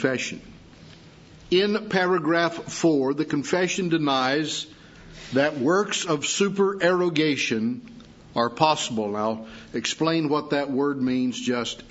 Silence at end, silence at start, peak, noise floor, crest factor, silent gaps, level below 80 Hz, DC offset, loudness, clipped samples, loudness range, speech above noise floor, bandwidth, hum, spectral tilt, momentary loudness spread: 0 s; 0 s; -4 dBFS; -48 dBFS; 20 dB; none; -60 dBFS; under 0.1%; -24 LUFS; under 0.1%; 2 LU; 24 dB; 8 kHz; none; -4 dB/octave; 7 LU